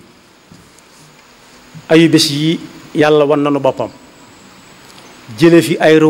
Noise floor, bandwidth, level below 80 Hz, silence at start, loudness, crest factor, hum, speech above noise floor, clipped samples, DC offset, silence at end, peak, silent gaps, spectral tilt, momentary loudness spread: -44 dBFS; 16 kHz; -54 dBFS; 1.75 s; -12 LUFS; 14 dB; none; 34 dB; under 0.1%; under 0.1%; 0 s; 0 dBFS; none; -5.5 dB/octave; 14 LU